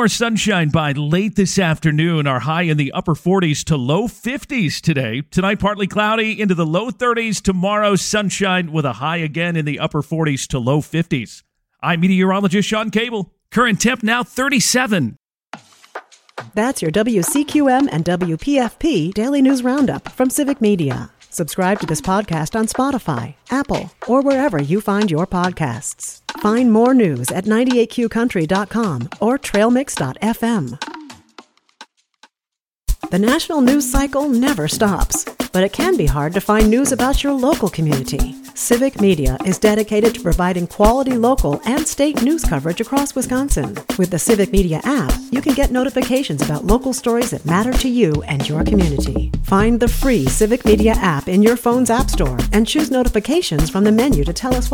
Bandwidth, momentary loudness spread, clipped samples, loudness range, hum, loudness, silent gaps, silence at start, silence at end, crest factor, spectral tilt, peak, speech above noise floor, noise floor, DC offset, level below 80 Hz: 19.5 kHz; 7 LU; under 0.1%; 3 LU; none; -17 LUFS; none; 0 s; 0 s; 16 dB; -5 dB/octave; 0 dBFS; 70 dB; -86 dBFS; under 0.1%; -28 dBFS